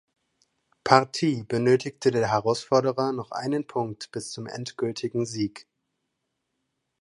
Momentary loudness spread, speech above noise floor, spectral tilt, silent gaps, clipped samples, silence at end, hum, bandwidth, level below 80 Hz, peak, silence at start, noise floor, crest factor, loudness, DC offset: 14 LU; 54 dB; -5.5 dB/octave; none; under 0.1%; 1.4 s; none; 11.5 kHz; -64 dBFS; 0 dBFS; 0.85 s; -79 dBFS; 26 dB; -26 LUFS; under 0.1%